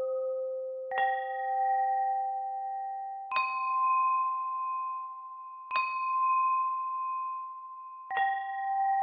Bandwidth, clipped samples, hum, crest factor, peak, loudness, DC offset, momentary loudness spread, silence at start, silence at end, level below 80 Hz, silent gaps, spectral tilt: 4.9 kHz; under 0.1%; none; 16 dB; -16 dBFS; -31 LUFS; under 0.1%; 12 LU; 0 s; 0 s; under -90 dBFS; none; -3 dB/octave